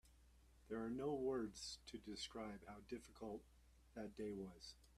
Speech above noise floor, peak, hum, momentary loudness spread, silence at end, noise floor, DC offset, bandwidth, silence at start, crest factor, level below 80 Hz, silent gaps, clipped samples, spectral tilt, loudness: 20 dB; -34 dBFS; none; 11 LU; 0 s; -70 dBFS; under 0.1%; 14 kHz; 0.05 s; 18 dB; -70 dBFS; none; under 0.1%; -4.5 dB/octave; -50 LUFS